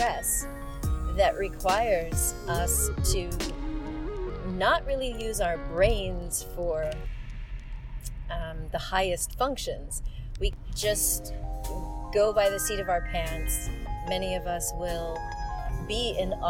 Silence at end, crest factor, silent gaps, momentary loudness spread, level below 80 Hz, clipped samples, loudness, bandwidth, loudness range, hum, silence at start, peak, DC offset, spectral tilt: 0 s; 20 dB; none; 12 LU; -34 dBFS; under 0.1%; -29 LUFS; 17.5 kHz; 5 LU; none; 0 s; -8 dBFS; under 0.1%; -3.5 dB/octave